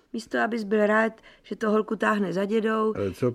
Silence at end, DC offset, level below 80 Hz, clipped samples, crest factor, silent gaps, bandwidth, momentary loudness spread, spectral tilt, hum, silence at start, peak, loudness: 0 s; under 0.1%; -62 dBFS; under 0.1%; 18 dB; none; 12.5 kHz; 7 LU; -6.5 dB/octave; none; 0.15 s; -8 dBFS; -25 LUFS